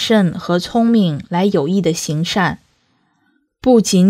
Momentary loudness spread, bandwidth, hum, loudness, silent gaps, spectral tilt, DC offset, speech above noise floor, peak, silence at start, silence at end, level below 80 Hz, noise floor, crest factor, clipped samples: 6 LU; 15.5 kHz; none; -16 LUFS; none; -5.5 dB/octave; under 0.1%; 48 dB; 0 dBFS; 0 s; 0 s; -50 dBFS; -62 dBFS; 14 dB; under 0.1%